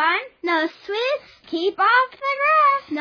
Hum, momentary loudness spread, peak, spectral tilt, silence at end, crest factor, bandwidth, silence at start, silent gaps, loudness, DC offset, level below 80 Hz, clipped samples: none; 9 LU; -6 dBFS; -3 dB/octave; 0 s; 14 dB; 5.4 kHz; 0 s; none; -20 LUFS; under 0.1%; -70 dBFS; under 0.1%